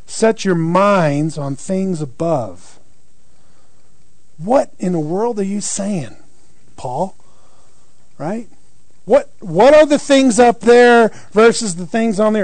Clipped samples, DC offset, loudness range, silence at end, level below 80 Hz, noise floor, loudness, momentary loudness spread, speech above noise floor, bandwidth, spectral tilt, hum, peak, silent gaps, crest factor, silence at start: under 0.1%; 3%; 13 LU; 0 s; -50 dBFS; -56 dBFS; -14 LUFS; 16 LU; 42 dB; 9.4 kHz; -5 dB/octave; none; -2 dBFS; none; 14 dB; 0.1 s